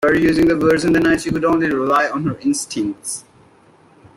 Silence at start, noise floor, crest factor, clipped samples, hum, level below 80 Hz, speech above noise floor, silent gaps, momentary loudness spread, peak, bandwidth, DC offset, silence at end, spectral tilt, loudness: 0 s; -50 dBFS; 14 dB; under 0.1%; none; -44 dBFS; 34 dB; none; 9 LU; -4 dBFS; 15 kHz; under 0.1%; 0.95 s; -5 dB/octave; -17 LUFS